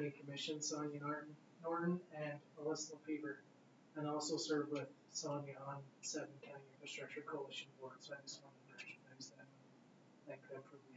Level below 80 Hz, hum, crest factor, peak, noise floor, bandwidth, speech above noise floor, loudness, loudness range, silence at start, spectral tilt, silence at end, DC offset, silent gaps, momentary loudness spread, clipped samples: under -90 dBFS; none; 18 dB; -28 dBFS; -67 dBFS; 7.6 kHz; 20 dB; -47 LUFS; 8 LU; 0 s; -4 dB/octave; 0 s; under 0.1%; none; 15 LU; under 0.1%